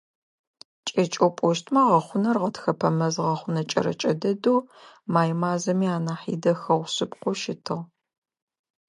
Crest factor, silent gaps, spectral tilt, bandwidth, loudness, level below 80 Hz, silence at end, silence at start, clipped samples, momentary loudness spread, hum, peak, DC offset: 18 dB; none; -6 dB/octave; 11 kHz; -24 LUFS; -72 dBFS; 1.05 s; 0.85 s; under 0.1%; 8 LU; none; -6 dBFS; under 0.1%